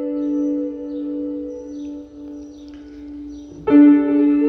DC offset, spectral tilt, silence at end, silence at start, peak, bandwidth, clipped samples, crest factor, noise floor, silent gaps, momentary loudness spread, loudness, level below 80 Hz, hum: under 0.1%; -8 dB/octave; 0 s; 0 s; -2 dBFS; 5.8 kHz; under 0.1%; 16 dB; -37 dBFS; none; 24 LU; -17 LUFS; -52 dBFS; none